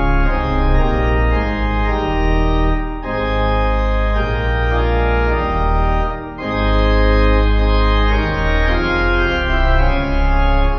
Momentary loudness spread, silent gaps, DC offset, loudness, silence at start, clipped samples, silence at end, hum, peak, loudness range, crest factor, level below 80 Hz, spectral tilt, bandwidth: 4 LU; none; under 0.1%; -17 LUFS; 0 s; under 0.1%; 0 s; none; -2 dBFS; 2 LU; 12 dB; -16 dBFS; -8 dB/octave; 6 kHz